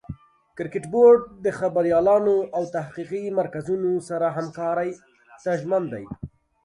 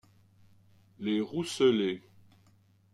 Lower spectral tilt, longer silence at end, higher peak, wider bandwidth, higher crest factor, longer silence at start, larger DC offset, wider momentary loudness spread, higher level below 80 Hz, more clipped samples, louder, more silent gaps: first, -7.5 dB/octave vs -5 dB/octave; second, 0.4 s vs 0.95 s; first, -6 dBFS vs -14 dBFS; second, 11 kHz vs 12.5 kHz; about the same, 18 dB vs 20 dB; second, 0.1 s vs 1 s; neither; first, 18 LU vs 12 LU; first, -56 dBFS vs -74 dBFS; neither; first, -23 LUFS vs -30 LUFS; neither